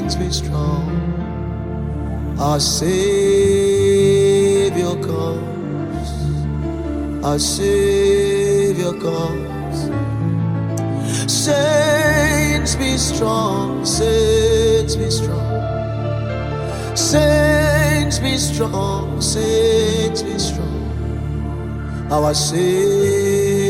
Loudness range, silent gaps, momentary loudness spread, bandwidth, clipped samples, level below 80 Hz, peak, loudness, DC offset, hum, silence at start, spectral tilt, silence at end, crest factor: 4 LU; none; 10 LU; 16 kHz; under 0.1%; -30 dBFS; -2 dBFS; -17 LUFS; under 0.1%; none; 0 s; -5 dB/octave; 0 s; 16 dB